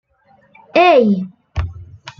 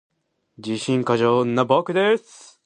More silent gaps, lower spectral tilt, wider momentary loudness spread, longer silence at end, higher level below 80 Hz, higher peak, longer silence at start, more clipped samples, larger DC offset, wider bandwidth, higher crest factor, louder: neither; first, -7.5 dB/octave vs -6 dB/octave; first, 18 LU vs 9 LU; second, 0.1 s vs 0.45 s; first, -38 dBFS vs -66 dBFS; about the same, -2 dBFS vs -4 dBFS; first, 0.75 s vs 0.6 s; neither; neither; second, 7.2 kHz vs 11 kHz; about the same, 16 dB vs 18 dB; first, -14 LUFS vs -20 LUFS